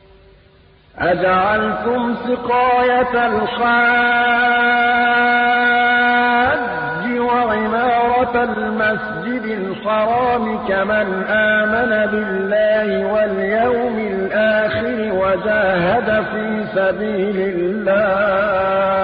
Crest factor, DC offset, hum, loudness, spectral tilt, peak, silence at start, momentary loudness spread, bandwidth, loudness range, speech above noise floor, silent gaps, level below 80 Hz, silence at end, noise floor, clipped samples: 10 dB; under 0.1%; none; -16 LUFS; -10.5 dB/octave; -6 dBFS; 0.95 s; 6 LU; 5 kHz; 4 LU; 33 dB; none; -46 dBFS; 0 s; -49 dBFS; under 0.1%